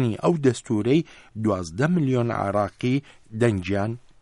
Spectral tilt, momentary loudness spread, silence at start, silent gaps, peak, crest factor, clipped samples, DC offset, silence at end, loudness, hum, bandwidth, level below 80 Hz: -7 dB/octave; 7 LU; 0 s; none; -8 dBFS; 16 dB; under 0.1%; under 0.1%; 0.25 s; -24 LUFS; none; 11.5 kHz; -56 dBFS